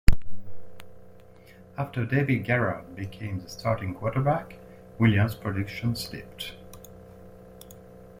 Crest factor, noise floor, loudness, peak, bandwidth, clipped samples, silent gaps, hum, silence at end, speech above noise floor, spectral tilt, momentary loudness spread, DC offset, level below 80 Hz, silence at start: 24 dB; -51 dBFS; -28 LUFS; -2 dBFS; 16 kHz; under 0.1%; none; none; 0 s; 24 dB; -7 dB/octave; 24 LU; under 0.1%; -36 dBFS; 0.1 s